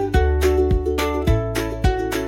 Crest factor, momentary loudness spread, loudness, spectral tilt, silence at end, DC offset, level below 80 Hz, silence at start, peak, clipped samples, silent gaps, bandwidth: 14 dB; 4 LU; -20 LUFS; -6.5 dB/octave; 0 s; under 0.1%; -24 dBFS; 0 s; -4 dBFS; under 0.1%; none; 16.5 kHz